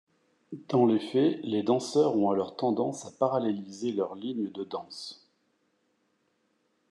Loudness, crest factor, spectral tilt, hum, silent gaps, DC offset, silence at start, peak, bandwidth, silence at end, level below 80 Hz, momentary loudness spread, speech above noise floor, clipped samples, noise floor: -29 LUFS; 18 dB; -6.5 dB/octave; none; none; under 0.1%; 0.5 s; -12 dBFS; 11 kHz; 1.75 s; -82 dBFS; 13 LU; 45 dB; under 0.1%; -74 dBFS